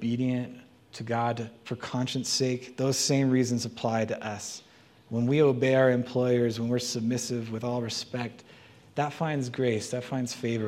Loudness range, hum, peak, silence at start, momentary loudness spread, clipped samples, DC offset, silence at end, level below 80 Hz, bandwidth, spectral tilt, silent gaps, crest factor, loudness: 5 LU; none; -10 dBFS; 0 s; 13 LU; under 0.1%; under 0.1%; 0 s; -70 dBFS; 15.5 kHz; -5 dB/octave; none; 18 dB; -28 LUFS